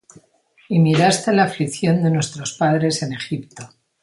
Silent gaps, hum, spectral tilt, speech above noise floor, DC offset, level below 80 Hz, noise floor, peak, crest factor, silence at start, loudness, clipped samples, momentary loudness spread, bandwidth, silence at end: none; none; -5.5 dB/octave; 38 dB; under 0.1%; -58 dBFS; -57 dBFS; -2 dBFS; 18 dB; 0.7 s; -19 LUFS; under 0.1%; 13 LU; 11.5 kHz; 0.35 s